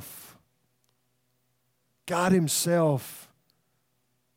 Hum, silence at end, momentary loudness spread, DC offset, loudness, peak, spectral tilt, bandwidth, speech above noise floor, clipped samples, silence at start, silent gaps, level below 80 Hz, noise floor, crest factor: none; 1.15 s; 23 LU; under 0.1%; -25 LUFS; -10 dBFS; -5 dB/octave; 16.5 kHz; 49 dB; under 0.1%; 0 s; none; -66 dBFS; -74 dBFS; 20 dB